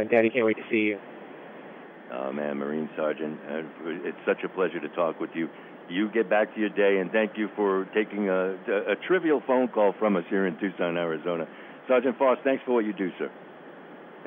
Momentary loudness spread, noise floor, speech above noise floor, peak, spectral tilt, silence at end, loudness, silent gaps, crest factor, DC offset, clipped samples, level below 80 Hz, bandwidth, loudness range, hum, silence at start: 20 LU; -45 dBFS; 19 dB; -6 dBFS; -9 dB/octave; 0 s; -27 LUFS; none; 20 dB; under 0.1%; under 0.1%; -86 dBFS; 3.8 kHz; 6 LU; none; 0 s